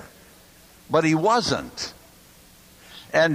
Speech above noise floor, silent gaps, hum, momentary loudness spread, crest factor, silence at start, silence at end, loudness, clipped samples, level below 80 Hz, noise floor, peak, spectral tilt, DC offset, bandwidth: 29 dB; none; none; 18 LU; 18 dB; 0 s; 0 s; -23 LUFS; under 0.1%; -56 dBFS; -51 dBFS; -6 dBFS; -4.5 dB/octave; under 0.1%; 15.5 kHz